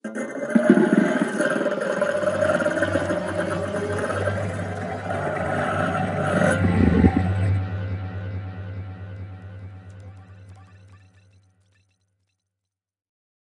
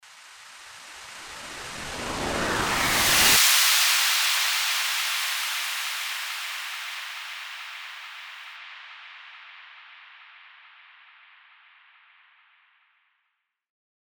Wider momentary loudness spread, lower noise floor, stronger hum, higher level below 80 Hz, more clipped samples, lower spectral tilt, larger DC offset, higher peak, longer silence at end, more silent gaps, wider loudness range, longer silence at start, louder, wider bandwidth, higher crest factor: second, 19 LU vs 26 LU; first, -85 dBFS vs -78 dBFS; neither; first, -46 dBFS vs -54 dBFS; neither; first, -7 dB/octave vs 0 dB/octave; neither; first, -2 dBFS vs -6 dBFS; second, 2.45 s vs 3.7 s; neither; second, 17 LU vs 21 LU; about the same, 0.05 s vs 0.05 s; about the same, -23 LUFS vs -22 LUFS; second, 11 kHz vs over 20 kHz; about the same, 22 dB vs 22 dB